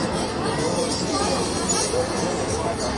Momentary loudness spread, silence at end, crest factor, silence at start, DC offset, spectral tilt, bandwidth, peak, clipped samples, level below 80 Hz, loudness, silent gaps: 3 LU; 0 s; 14 dB; 0 s; under 0.1%; -3.5 dB/octave; 11.5 kHz; -10 dBFS; under 0.1%; -42 dBFS; -23 LUFS; none